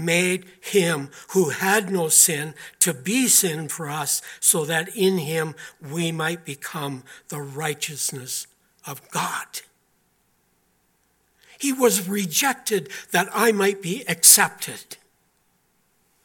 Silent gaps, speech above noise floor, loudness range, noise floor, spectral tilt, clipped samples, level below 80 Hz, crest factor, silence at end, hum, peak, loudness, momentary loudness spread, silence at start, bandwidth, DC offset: none; 44 dB; 11 LU; -66 dBFS; -2.5 dB/octave; under 0.1%; -74 dBFS; 24 dB; 1.3 s; none; 0 dBFS; -20 LUFS; 18 LU; 0 s; 17.5 kHz; under 0.1%